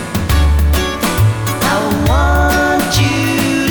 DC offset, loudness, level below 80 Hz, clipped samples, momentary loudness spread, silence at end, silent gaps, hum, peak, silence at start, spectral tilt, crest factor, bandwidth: under 0.1%; -13 LUFS; -18 dBFS; under 0.1%; 3 LU; 0 s; none; none; -4 dBFS; 0 s; -5 dB/octave; 10 dB; over 20 kHz